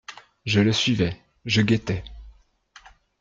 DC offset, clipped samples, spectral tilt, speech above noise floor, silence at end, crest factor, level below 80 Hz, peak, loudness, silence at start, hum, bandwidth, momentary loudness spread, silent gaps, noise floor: under 0.1%; under 0.1%; -5.5 dB/octave; 32 dB; 0.9 s; 18 dB; -48 dBFS; -8 dBFS; -22 LUFS; 0.1 s; none; 7.6 kHz; 17 LU; none; -54 dBFS